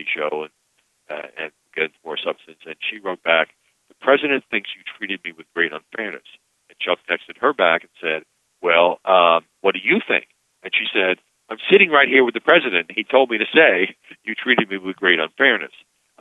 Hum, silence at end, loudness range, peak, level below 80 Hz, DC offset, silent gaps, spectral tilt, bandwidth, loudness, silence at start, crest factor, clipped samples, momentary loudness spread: none; 0.55 s; 9 LU; 0 dBFS; -76 dBFS; under 0.1%; none; -5.5 dB/octave; 7.8 kHz; -18 LUFS; 0 s; 20 dB; under 0.1%; 16 LU